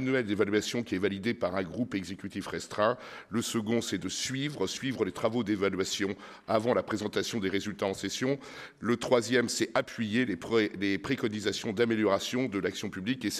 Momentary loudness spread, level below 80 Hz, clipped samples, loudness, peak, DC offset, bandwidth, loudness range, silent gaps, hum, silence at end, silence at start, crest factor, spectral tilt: 8 LU; -66 dBFS; under 0.1%; -31 LUFS; -10 dBFS; under 0.1%; 15 kHz; 3 LU; none; none; 0 s; 0 s; 20 dB; -4.5 dB/octave